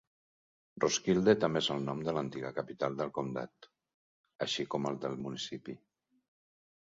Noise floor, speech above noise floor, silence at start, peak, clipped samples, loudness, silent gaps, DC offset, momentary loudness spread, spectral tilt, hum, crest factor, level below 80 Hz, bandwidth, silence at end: under -90 dBFS; over 56 dB; 0.75 s; -12 dBFS; under 0.1%; -34 LUFS; 3.94-4.24 s, 4.35-4.39 s; under 0.1%; 13 LU; -4 dB/octave; none; 22 dB; -68 dBFS; 7.6 kHz; 1.15 s